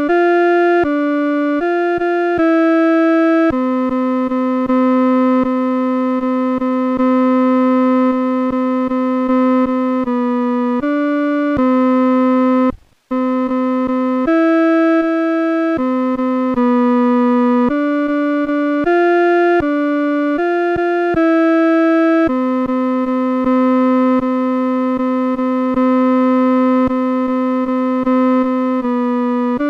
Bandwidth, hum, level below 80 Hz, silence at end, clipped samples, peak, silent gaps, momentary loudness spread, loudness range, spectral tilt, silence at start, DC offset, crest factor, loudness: 5.8 kHz; none; -48 dBFS; 0 s; under 0.1%; -6 dBFS; none; 4 LU; 1 LU; -7 dB/octave; 0 s; under 0.1%; 8 dB; -15 LUFS